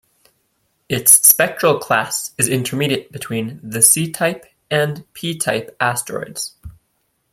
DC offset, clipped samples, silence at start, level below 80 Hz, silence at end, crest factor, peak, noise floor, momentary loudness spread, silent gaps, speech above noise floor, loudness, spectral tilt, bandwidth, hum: under 0.1%; under 0.1%; 0.9 s; -54 dBFS; 0.6 s; 18 dB; 0 dBFS; -67 dBFS; 16 LU; none; 50 dB; -16 LUFS; -2.5 dB/octave; 16.5 kHz; none